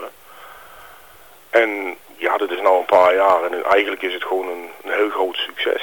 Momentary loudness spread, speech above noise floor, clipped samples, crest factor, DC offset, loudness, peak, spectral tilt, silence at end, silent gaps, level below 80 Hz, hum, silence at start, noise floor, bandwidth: 12 LU; 28 dB; under 0.1%; 16 dB; 0.3%; -18 LUFS; -4 dBFS; -3 dB/octave; 0 s; none; -62 dBFS; none; 0 s; -46 dBFS; 19 kHz